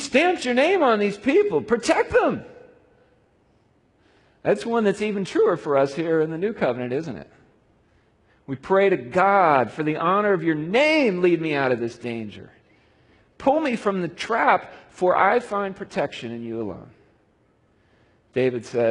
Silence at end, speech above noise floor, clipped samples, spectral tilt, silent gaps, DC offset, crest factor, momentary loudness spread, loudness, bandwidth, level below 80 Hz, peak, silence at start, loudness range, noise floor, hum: 0 s; 41 dB; under 0.1%; -5.5 dB/octave; none; under 0.1%; 20 dB; 13 LU; -22 LUFS; 11 kHz; -60 dBFS; -2 dBFS; 0 s; 6 LU; -62 dBFS; none